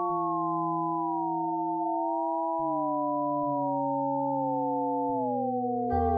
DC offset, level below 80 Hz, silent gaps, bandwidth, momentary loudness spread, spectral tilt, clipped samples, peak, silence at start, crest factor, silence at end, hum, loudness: under 0.1%; -52 dBFS; none; 2.1 kHz; 1 LU; -13 dB/octave; under 0.1%; -16 dBFS; 0 s; 12 dB; 0 s; none; -29 LUFS